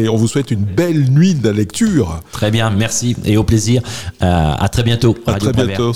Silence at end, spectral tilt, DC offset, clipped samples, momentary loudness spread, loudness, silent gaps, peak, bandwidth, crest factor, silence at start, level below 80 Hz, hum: 0 s; -6 dB/octave; 1%; under 0.1%; 5 LU; -15 LUFS; none; -2 dBFS; 15.5 kHz; 12 dB; 0 s; -34 dBFS; none